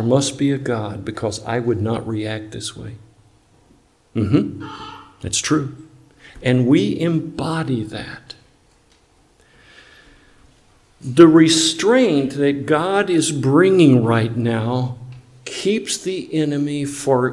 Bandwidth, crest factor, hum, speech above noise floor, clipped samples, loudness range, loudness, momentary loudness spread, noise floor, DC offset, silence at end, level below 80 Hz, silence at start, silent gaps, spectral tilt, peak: 12 kHz; 18 dB; none; 38 dB; under 0.1%; 11 LU; -18 LUFS; 19 LU; -55 dBFS; under 0.1%; 0 s; -54 dBFS; 0 s; none; -5 dB/octave; 0 dBFS